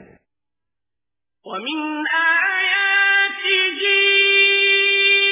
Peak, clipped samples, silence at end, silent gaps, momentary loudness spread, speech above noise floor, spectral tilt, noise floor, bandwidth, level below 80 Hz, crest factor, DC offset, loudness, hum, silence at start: -4 dBFS; under 0.1%; 0 s; none; 12 LU; 68 dB; 3.5 dB/octave; -88 dBFS; 3.9 kHz; -74 dBFS; 14 dB; under 0.1%; -14 LUFS; none; 1.45 s